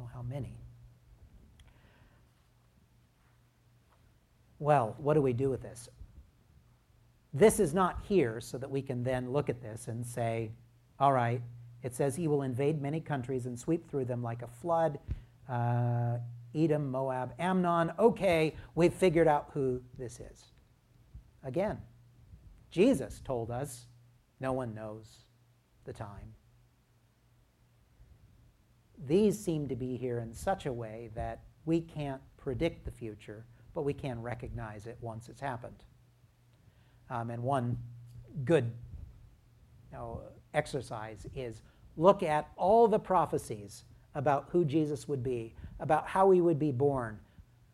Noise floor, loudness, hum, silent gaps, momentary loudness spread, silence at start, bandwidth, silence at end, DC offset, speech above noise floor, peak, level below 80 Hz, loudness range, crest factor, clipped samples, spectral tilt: -68 dBFS; -32 LUFS; none; none; 19 LU; 0 s; 14.5 kHz; 0.3 s; under 0.1%; 36 dB; -8 dBFS; -56 dBFS; 12 LU; 24 dB; under 0.1%; -7 dB/octave